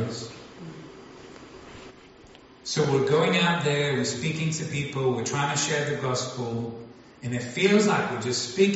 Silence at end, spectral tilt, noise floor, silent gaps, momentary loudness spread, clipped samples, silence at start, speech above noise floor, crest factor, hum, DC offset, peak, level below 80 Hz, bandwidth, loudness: 0 s; -4 dB/octave; -50 dBFS; none; 23 LU; under 0.1%; 0 s; 25 dB; 18 dB; none; under 0.1%; -8 dBFS; -62 dBFS; 8 kHz; -25 LUFS